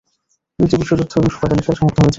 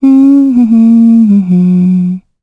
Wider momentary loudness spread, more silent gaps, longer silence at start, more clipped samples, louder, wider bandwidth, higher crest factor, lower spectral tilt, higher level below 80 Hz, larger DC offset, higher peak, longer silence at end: about the same, 3 LU vs 5 LU; neither; first, 0.6 s vs 0 s; neither; second, -16 LUFS vs -7 LUFS; first, 7.8 kHz vs 3.7 kHz; first, 14 dB vs 6 dB; second, -7.5 dB/octave vs -11 dB/octave; first, -36 dBFS vs -50 dBFS; neither; about the same, -2 dBFS vs 0 dBFS; second, 0 s vs 0.25 s